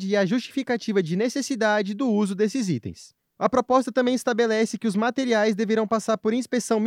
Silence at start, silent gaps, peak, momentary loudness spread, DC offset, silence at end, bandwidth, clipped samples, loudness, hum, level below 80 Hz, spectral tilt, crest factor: 0 s; none; -6 dBFS; 5 LU; under 0.1%; 0 s; 15 kHz; under 0.1%; -23 LUFS; none; -66 dBFS; -5 dB/octave; 16 dB